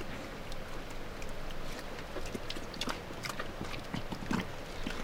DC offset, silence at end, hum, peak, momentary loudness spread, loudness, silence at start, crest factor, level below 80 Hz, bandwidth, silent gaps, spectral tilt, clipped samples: under 0.1%; 0 s; none; -18 dBFS; 7 LU; -41 LUFS; 0 s; 20 dB; -44 dBFS; 17 kHz; none; -4.5 dB/octave; under 0.1%